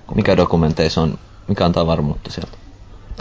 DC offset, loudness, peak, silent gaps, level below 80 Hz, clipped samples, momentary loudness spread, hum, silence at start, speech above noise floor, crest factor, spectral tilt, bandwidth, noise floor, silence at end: under 0.1%; -17 LUFS; -2 dBFS; none; -32 dBFS; under 0.1%; 16 LU; none; 0.1 s; 22 dB; 16 dB; -7 dB/octave; 7.6 kHz; -38 dBFS; 0 s